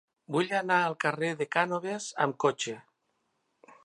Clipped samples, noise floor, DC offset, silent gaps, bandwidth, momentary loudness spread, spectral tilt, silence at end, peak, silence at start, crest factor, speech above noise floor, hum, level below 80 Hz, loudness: under 0.1%; -77 dBFS; under 0.1%; none; 11.5 kHz; 9 LU; -4 dB/octave; 0.1 s; -10 dBFS; 0.3 s; 22 dB; 48 dB; none; -82 dBFS; -29 LUFS